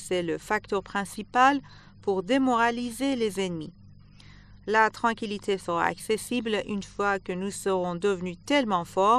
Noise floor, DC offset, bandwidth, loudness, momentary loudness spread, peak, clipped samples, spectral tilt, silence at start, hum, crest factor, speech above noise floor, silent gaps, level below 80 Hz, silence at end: -50 dBFS; under 0.1%; 13 kHz; -27 LUFS; 10 LU; -6 dBFS; under 0.1%; -4.5 dB/octave; 0 s; none; 20 dB; 24 dB; none; -56 dBFS; 0 s